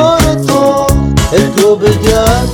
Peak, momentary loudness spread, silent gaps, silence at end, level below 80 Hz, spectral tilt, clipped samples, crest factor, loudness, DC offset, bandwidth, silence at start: 0 dBFS; 2 LU; none; 0 s; -20 dBFS; -5.5 dB/octave; 1%; 8 dB; -9 LUFS; under 0.1%; over 20 kHz; 0 s